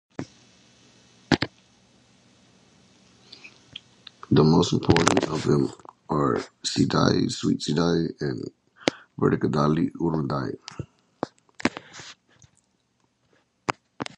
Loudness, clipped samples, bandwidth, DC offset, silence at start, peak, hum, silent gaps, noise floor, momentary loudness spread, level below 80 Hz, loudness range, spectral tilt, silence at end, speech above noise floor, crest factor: -24 LUFS; under 0.1%; 11 kHz; under 0.1%; 0.2 s; 0 dBFS; none; none; -70 dBFS; 22 LU; -50 dBFS; 11 LU; -5.5 dB/octave; 0.15 s; 47 dB; 26 dB